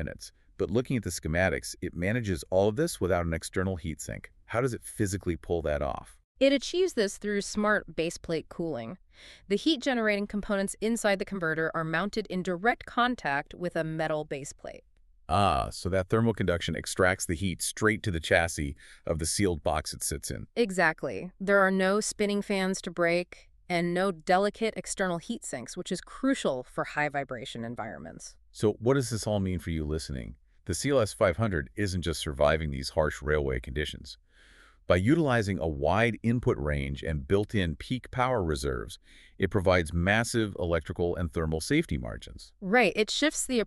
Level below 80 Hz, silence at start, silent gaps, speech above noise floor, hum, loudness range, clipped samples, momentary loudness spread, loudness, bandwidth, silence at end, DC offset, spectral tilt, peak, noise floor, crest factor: -46 dBFS; 0 s; 6.24-6.35 s; 28 dB; none; 3 LU; under 0.1%; 11 LU; -29 LUFS; 13.5 kHz; 0 s; under 0.1%; -5 dB/octave; -8 dBFS; -57 dBFS; 22 dB